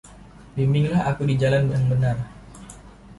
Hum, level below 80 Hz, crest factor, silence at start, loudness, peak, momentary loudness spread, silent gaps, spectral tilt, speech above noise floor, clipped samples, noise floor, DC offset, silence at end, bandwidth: none; -46 dBFS; 14 dB; 0.05 s; -22 LUFS; -8 dBFS; 22 LU; none; -8 dB/octave; 25 dB; under 0.1%; -45 dBFS; under 0.1%; 0.05 s; 11.5 kHz